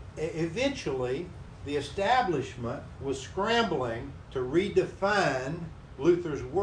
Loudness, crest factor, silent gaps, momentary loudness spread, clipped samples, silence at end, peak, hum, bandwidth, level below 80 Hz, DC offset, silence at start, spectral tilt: -30 LUFS; 18 dB; none; 11 LU; under 0.1%; 0 s; -12 dBFS; none; 10.5 kHz; -50 dBFS; under 0.1%; 0 s; -5.5 dB/octave